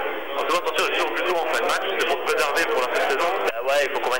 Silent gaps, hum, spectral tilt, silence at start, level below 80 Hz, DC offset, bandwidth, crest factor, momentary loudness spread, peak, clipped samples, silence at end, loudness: none; none; -1 dB/octave; 0 s; -64 dBFS; 2%; 17 kHz; 16 dB; 2 LU; -6 dBFS; under 0.1%; 0 s; -22 LUFS